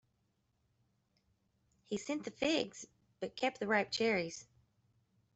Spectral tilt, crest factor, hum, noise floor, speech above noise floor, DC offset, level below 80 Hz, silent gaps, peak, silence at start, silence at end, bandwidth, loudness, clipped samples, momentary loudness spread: -3.5 dB/octave; 22 dB; none; -79 dBFS; 43 dB; under 0.1%; -76 dBFS; none; -18 dBFS; 1.9 s; 0.95 s; 8.2 kHz; -37 LUFS; under 0.1%; 14 LU